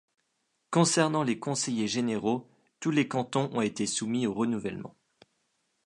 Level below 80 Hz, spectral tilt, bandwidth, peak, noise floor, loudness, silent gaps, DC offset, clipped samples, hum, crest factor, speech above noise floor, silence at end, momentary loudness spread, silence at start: -70 dBFS; -4.5 dB/octave; 11.5 kHz; -8 dBFS; -77 dBFS; -29 LUFS; none; under 0.1%; under 0.1%; none; 22 dB; 49 dB; 0.95 s; 10 LU; 0.7 s